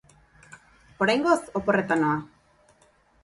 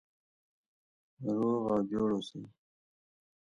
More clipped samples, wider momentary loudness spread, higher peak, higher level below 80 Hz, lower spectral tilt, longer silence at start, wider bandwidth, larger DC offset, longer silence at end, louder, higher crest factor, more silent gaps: neither; second, 4 LU vs 13 LU; first, -8 dBFS vs -20 dBFS; first, -60 dBFS vs -68 dBFS; second, -5.5 dB/octave vs -8 dB/octave; second, 0.5 s vs 1.2 s; about the same, 11.5 kHz vs 10.5 kHz; neither; about the same, 1 s vs 0.9 s; first, -24 LUFS vs -33 LUFS; about the same, 20 dB vs 16 dB; neither